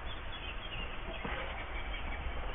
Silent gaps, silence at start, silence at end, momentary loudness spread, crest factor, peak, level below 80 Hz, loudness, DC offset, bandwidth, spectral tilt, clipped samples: none; 0 s; 0 s; 3 LU; 14 dB; -26 dBFS; -42 dBFS; -41 LUFS; under 0.1%; 3.8 kHz; -2 dB/octave; under 0.1%